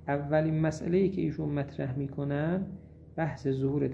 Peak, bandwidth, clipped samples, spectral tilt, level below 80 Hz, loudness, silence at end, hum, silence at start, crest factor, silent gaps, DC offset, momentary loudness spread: -12 dBFS; 8.4 kHz; under 0.1%; -8.5 dB/octave; -54 dBFS; -31 LUFS; 0 s; none; 0 s; 18 dB; none; under 0.1%; 7 LU